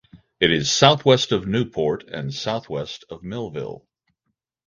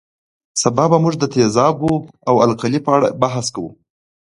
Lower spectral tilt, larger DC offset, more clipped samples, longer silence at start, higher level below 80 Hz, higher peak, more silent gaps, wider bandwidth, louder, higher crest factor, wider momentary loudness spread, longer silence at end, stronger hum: second, -4 dB/octave vs -5.5 dB/octave; neither; neither; second, 0.15 s vs 0.55 s; about the same, -52 dBFS vs -50 dBFS; about the same, 0 dBFS vs 0 dBFS; neither; second, 9.6 kHz vs 11.5 kHz; second, -20 LUFS vs -16 LUFS; first, 22 dB vs 16 dB; first, 17 LU vs 9 LU; first, 0.9 s vs 0.5 s; neither